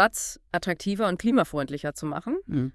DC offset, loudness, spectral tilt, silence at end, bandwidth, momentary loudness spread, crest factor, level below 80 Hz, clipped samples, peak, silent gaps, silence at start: under 0.1%; -27 LUFS; -5 dB/octave; 0.05 s; 12 kHz; 9 LU; 20 dB; -52 dBFS; under 0.1%; -6 dBFS; none; 0 s